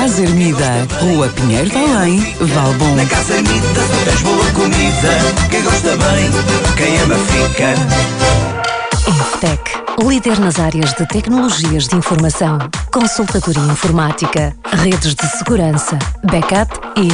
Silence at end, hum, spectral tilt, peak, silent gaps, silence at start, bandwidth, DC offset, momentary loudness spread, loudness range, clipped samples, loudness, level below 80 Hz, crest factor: 0 s; none; -4.5 dB/octave; -2 dBFS; none; 0 s; 10.5 kHz; under 0.1%; 4 LU; 2 LU; under 0.1%; -13 LUFS; -24 dBFS; 10 dB